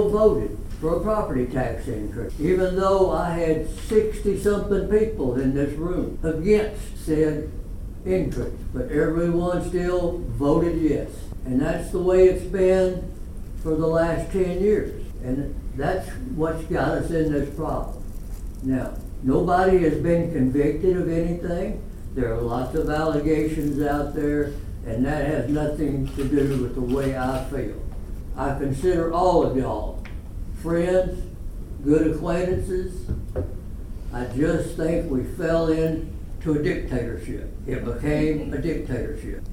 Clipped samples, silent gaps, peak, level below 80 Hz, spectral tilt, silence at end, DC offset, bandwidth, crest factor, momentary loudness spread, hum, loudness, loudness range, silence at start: under 0.1%; none; -6 dBFS; -32 dBFS; -7.5 dB/octave; 0 s; under 0.1%; 16 kHz; 18 dB; 14 LU; none; -24 LUFS; 4 LU; 0 s